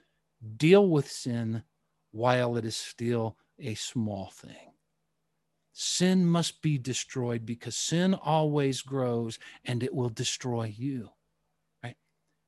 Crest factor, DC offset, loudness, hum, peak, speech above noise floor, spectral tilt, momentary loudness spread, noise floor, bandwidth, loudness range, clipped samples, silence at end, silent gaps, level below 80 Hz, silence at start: 22 dB; under 0.1%; -29 LUFS; none; -8 dBFS; 52 dB; -5 dB/octave; 16 LU; -80 dBFS; 12.5 kHz; 7 LU; under 0.1%; 0.55 s; none; -66 dBFS; 0.4 s